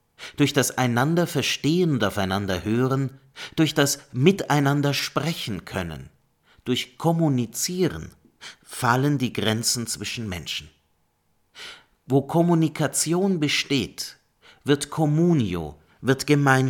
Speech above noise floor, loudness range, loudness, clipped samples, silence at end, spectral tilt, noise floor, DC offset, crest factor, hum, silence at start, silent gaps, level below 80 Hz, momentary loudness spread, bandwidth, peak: 45 dB; 4 LU; -23 LUFS; under 0.1%; 0 s; -5 dB/octave; -68 dBFS; under 0.1%; 20 dB; none; 0.2 s; none; -54 dBFS; 14 LU; 18.5 kHz; -4 dBFS